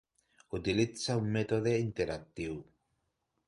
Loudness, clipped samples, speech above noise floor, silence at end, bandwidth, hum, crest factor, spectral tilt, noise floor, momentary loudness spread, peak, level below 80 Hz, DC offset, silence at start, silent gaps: -34 LUFS; under 0.1%; 48 dB; 0.85 s; 11.5 kHz; none; 18 dB; -6 dB/octave; -81 dBFS; 10 LU; -16 dBFS; -58 dBFS; under 0.1%; 0.5 s; none